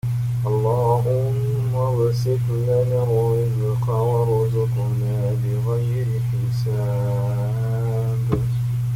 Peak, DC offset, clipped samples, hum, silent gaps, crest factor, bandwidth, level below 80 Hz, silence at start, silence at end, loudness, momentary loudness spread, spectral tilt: -6 dBFS; under 0.1%; under 0.1%; 50 Hz at -40 dBFS; none; 14 dB; 15.5 kHz; -44 dBFS; 0.05 s; 0 s; -21 LUFS; 3 LU; -8.5 dB/octave